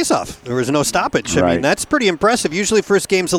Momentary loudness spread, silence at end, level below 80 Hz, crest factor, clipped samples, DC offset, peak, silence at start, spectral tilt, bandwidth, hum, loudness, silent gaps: 4 LU; 0 s; -44 dBFS; 14 dB; under 0.1%; under 0.1%; -2 dBFS; 0 s; -4 dB/octave; 17 kHz; none; -16 LUFS; none